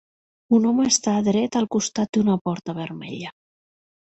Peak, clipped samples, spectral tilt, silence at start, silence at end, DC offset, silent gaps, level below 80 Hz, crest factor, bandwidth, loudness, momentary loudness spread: -6 dBFS; under 0.1%; -4.5 dB/octave; 0.5 s; 0.85 s; under 0.1%; 2.09-2.13 s, 2.41-2.45 s; -62 dBFS; 18 dB; 8.2 kHz; -21 LUFS; 14 LU